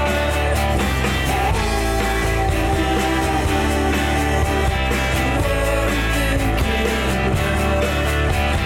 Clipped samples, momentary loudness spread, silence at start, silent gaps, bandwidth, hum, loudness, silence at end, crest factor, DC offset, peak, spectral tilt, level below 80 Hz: under 0.1%; 1 LU; 0 s; none; 17 kHz; none; -19 LUFS; 0 s; 10 dB; under 0.1%; -8 dBFS; -5 dB/octave; -24 dBFS